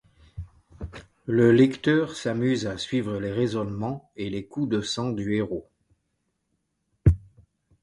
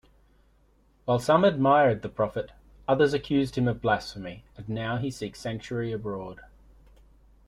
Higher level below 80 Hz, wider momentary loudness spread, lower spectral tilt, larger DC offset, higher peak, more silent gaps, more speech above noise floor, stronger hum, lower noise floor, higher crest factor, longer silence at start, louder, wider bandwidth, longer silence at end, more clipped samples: first, -40 dBFS vs -54 dBFS; first, 21 LU vs 17 LU; about the same, -6.5 dB/octave vs -6.5 dB/octave; neither; about the same, -6 dBFS vs -8 dBFS; neither; first, 52 dB vs 37 dB; neither; first, -76 dBFS vs -62 dBFS; about the same, 20 dB vs 20 dB; second, 0.35 s vs 1.05 s; about the same, -25 LUFS vs -26 LUFS; second, 11.5 kHz vs 14 kHz; second, 0.65 s vs 1.05 s; neither